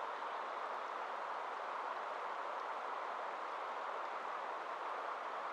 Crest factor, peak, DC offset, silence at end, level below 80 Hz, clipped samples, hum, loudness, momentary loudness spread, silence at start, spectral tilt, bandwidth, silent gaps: 12 dB; -30 dBFS; under 0.1%; 0 s; under -90 dBFS; under 0.1%; none; -43 LUFS; 1 LU; 0 s; -2 dB/octave; 13 kHz; none